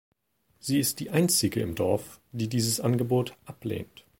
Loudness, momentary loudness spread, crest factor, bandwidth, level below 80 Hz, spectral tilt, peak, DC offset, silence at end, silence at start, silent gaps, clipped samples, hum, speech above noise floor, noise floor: -27 LUFS; 13 LU; 20 dB; 17 kHz; -58 dBFS; -4.5 dB/octave; -8 dBFS; under 0.1%; 0.35 s; 0.65 s; none; under 0.1%; none; 42 dB; -70 dBFS